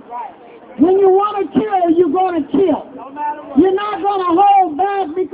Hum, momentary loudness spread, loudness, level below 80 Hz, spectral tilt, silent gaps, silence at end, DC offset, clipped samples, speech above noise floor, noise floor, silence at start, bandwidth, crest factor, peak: none; 14 LU; -15 LUFS; -52 dBFS; -10 dB/octave; none; 0.05 s; under 0.1%; under 0.1%; 24 dB; -38 dBFS; 0.1 s; 4 kHz; 14 dB; 0 dBFS